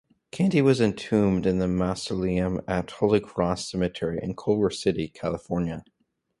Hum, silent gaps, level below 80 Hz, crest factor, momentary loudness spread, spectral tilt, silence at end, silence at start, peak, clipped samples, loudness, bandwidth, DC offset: none; none; -48 dBFS; 18 dB; 8 LU; -6.5 dB/octave; 0.6 s; 0.35 s; -6 dBFS; under 0.1%; -25 LUFS; 11.5 kHz; under 0.1%